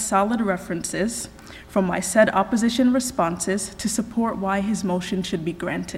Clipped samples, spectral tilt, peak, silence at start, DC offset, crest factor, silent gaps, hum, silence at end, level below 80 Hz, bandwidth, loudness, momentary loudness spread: under 0.1%; -4.5 dB/octave; -4 dBFS; 0 s; under 0.1%; 20 dB; none; none; 0 s; -48 dBFS; 15.5 kHz; -23 LUFS; 8 LU